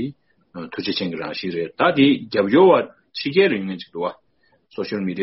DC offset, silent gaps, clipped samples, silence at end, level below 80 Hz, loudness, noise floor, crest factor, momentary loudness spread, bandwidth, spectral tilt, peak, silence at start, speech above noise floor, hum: under 0.1%; none; under 0.1%; 0 s; -62 dBFS; -20 LUFS; -61 dBFS; 18 dB; 17 LU; 6 kHz; -4 dB/octave; -2 dBFS; 0 s; 42 dB; none